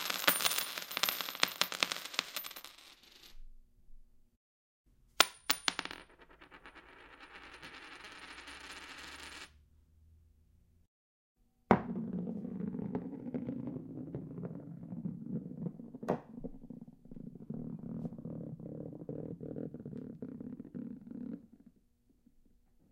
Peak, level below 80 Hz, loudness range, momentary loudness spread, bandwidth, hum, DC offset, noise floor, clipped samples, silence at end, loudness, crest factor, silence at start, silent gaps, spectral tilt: -4 dBFS; -64 dBFS; 13 LU; 21 LU; 16.5 kHz; none; under 0.1%; -71 dBFS; under 0.1%; 1.25 s; -38 LUFS; 38 dB; 0 s; 4.36-4.84 s, 10.87-11.35 s; -3 dB/octave